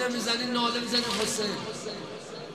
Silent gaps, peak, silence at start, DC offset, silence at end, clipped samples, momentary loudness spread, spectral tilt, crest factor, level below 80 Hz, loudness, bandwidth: none; -12 dBFS; 0 s; under 0.1%; 0 s; under 0.1%; 12 LU; -2.5 dB/octave; 18 dB; -62 dBFS; -28 LUFS; 15 kHz